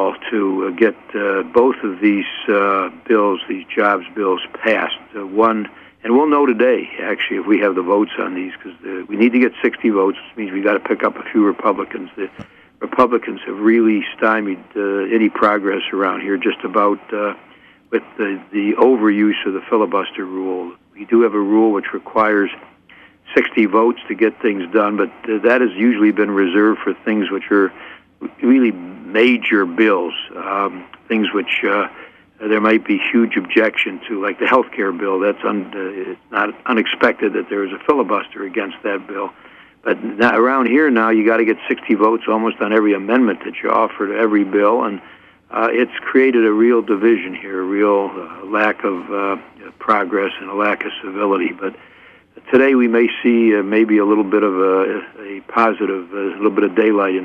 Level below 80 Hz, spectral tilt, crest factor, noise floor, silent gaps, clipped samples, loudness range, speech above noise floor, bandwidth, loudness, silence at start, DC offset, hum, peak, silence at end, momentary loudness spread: -64 dBFS; -7 dB/octave; 16 dB; -46 dBFS; none; under 0.1%; 3 LU; 30 dB; 5.4 kHz; -17 LUFS; 0 s; under 0.1%; none; -2 dBFS; 0 s; 11 LU